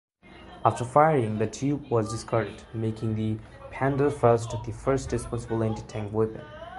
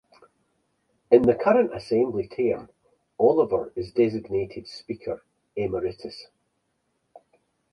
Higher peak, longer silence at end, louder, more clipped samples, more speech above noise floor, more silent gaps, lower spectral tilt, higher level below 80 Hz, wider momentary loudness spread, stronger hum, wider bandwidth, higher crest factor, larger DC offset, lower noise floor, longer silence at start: about the same, -4 dBFS vs -4 dBFS; second, 0 s vs 1.5 s; second, -27 LUFS vs -24 LUFS; neither; second, 22 dB vs 51 dB; neither; about the same, -7 dB/octave vs -8 dB/octave; first, -48 dBFS vs -58 dBFS; second, 12 LU vs 18 LU; neither; about the same, 11.5 kHz vs 10.5 kHz; about the same, 22 dB vs 22 dB; neither; second, -48 dBFS vs -74 dBFS; second, 0.25 s vs 1.1 s